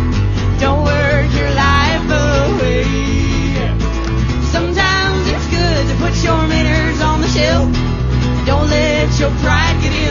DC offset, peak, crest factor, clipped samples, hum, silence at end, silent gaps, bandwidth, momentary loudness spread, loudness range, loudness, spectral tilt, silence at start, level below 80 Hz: under 0.1%; 0 dBFS; 14 dB; under 0.1%; none; 0 s; none; 7.4 kHz; 4 LU; 1 LU; -14 LUFS; -5.5 dB/octave; 0 s; -20 dBFS